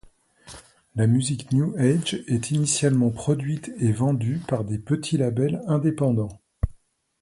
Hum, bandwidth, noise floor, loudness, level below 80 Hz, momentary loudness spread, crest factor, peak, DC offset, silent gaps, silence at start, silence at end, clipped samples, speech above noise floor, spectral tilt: none; 11.5 kHz; -57 dBFS; -24 LUFS; -44 dBFS; 11 LU; 16 dB; -8 dBFS; under 0.1%; none; 0.45 s; 0.5 s; under 0.1%; 34 dB; -6 dB/octave